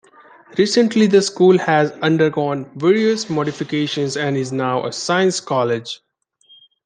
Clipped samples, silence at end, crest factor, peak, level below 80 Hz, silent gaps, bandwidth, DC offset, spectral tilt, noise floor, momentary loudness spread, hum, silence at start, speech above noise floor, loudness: under 0.1%; 0.9 s; 16 dB; -2 dBFS; -64 dBFS; none; 9.8 kHz; under 0.1%; -5 dB/octave; -53 dBFS; 8 LU; none; 0.5 s; 37 dB; -17 LUFS